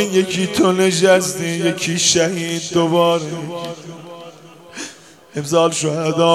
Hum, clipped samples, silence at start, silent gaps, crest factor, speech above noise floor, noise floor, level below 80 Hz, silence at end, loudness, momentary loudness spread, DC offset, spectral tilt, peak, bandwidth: none; under 0.1%; 0 s; none; 18 dB; 23 dB; -40 dBFS; -60 dBFS; 0 s; -16 LUFS; 19 LU; under 0.1%; -4 dB/octave; 0 dBFS; 15 kHz